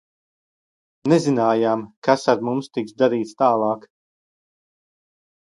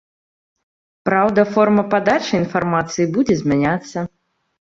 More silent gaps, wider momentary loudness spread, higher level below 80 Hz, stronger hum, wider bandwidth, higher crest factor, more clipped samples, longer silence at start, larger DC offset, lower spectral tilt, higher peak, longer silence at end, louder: first, 1.97-2.02 s vs none; about the same, 8 LU vs 10 LU; second, -68 dBFS vs -52 dBFS; neither; first, 11.5 kHz vs 7.8 kHz; about the same, 20 dB vs 16 dB; neither; about the same, 1.05 s vs 1.05 s; neither; about the same, -6.5 dB/octave vs -6 dB/octave; about the same, -2 dBFS vs -2 dBFS; first, 1.7 s vs 0.6 s; second, -20 LUFS vs -17 LUFS